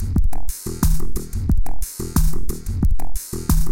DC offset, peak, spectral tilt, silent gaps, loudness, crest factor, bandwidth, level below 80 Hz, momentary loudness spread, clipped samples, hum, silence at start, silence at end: under 0.1%; -2 dBFS; -5.5 dB/octave; none; -24 LUFS; 12 dB; 17 kHz; -20 dBFS; 7 LU; under 0.1%; none; 0 s; 0 s